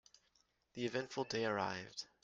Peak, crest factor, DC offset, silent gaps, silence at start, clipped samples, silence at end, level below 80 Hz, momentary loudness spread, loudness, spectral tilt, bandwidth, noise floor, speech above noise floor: -24 dBFS; 20 dB; under 0.1%; none; 0.75 s; under 0.1%; 0.2 s; -78 dBFS; 10 LU; -41 LUFS; -4 dB/octave; 9.8 kHz; -78 dBFS; 37 dB